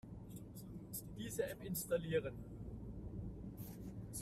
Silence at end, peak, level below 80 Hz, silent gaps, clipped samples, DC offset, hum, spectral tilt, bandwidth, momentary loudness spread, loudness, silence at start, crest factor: 0 s; -26 dBFS; -58 dBFS; none; under 0.1%; under 0.1%; none; -5 dB/octave; 15.5 kHz; 13 LU; -46 LUFS; 0.05 s; 20 dB